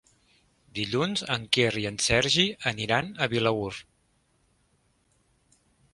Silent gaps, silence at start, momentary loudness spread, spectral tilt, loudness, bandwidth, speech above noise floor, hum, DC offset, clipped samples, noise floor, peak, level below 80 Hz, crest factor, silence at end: none; 0.75 s; 11 LU; -3.5 dB/octave; -26 LUFS; 11.5 kHz; 42 dB; none; under 0.1%; under 0.1%; -69 dBFS; -6 dBFS; -54 dBFS; 24 dB; 2.1 s